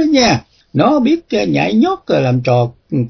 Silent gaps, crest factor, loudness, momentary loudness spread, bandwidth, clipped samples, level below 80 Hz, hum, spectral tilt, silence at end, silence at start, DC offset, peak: none; 14 dB; -14 LUFS; 6 LU; 5.4 kHz; under 0.1%; -46 dBFS; none; -6 dB/octave; 0 s; 0 s; under 0.1%; 0 dBFS